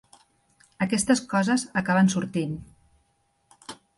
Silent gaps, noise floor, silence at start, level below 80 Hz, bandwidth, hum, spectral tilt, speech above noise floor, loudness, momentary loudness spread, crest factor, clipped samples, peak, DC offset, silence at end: none; -69 dBFS; 0.8 s; -60 dBFS; 11.5 kHz; none; -5 dB/octave; 46 dB; -24 LUFS; 20 LU; 18 dB; under 0.1%; -8 dBFS; under 0.1%; 0.25 s